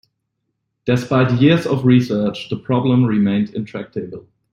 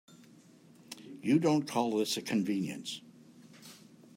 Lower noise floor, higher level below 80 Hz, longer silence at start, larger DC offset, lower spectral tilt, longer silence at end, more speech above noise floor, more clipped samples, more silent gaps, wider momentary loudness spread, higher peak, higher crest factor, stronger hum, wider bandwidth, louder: first, -74 dBFS vs -59 dBFS; first, -52 dBFS vs -80 dBFS; about the same, 0.85 s vs 0.9 s; neither; first, -8 dB/octave vs -5 dB/octave; about the same, 0.3 s vs 0.4 s; first, 57 dB vs 28 dB; neither; neither; second, 14 LU vs 24 LU; first, -2 dBFS vs -16 dBFS; about the same, 16 dB vs 20 dB; neither; second, 10 kHz vs 16 kHz; first, -17 LUFS vs -32 LUFS